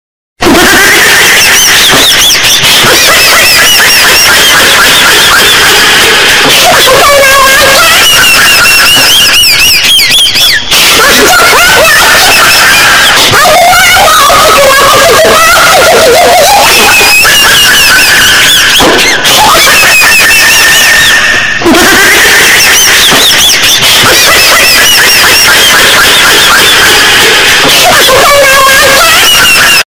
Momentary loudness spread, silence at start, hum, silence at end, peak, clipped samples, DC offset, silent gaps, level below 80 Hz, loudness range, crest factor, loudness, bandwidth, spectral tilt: 1 LU; 0.4 s; none; 0.05 s; 0 dBFS; 20%; 2%; none; -28 dBFS; 1 LU; 2 dB; 0 LUFS; over 20 kHz; -0.5 dB/octave